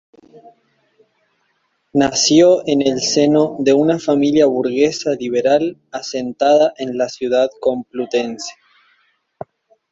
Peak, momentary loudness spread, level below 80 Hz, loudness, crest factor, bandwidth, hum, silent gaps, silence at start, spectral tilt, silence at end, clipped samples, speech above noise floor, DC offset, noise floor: 0 dBFS; 13 LU; -58 dBFS; -16 LUFS; 16 dB; 7.8 kHz; none; none; 1.95 s; -4 dB/octave; 1.4 s; under 0.1%; 50 dB; under 0.1%; -66 dBFS